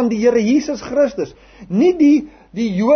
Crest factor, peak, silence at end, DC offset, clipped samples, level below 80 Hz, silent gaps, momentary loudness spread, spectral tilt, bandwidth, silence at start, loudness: 12 dB; -4 dBFS; 0 s; under 0.1%; under 0.1%; -50 dBFS; none; 12 LU; -6.5 dB/octave; 6.6 kHz; 0 s; -16 LUFS